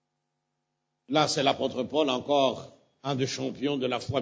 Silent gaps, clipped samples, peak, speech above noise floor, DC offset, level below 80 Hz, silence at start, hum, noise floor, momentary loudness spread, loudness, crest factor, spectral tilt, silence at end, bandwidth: none; under 0.1%; -8 dBFS; 54 dB; under 0.1%; -62 dBFS; 1.1 s; none; -81 dBFS; 6 LU; -27 LUFS; 20 dB; -4.5 dB/octave; 0 s; 8 kHz